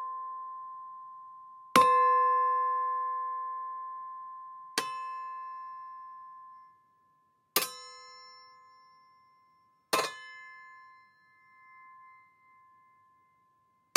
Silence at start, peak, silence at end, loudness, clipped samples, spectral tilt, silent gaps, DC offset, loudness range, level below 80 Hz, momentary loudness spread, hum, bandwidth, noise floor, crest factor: 0 s; -4 dBFS; 1.85 s; -30 LUFS; under 0.1%; -1.5 dB/octave; none; under 0.1%; 12 LU; -88 dBFS; 26 LU; none; 16 kHz; -70 dBFS; 30 dB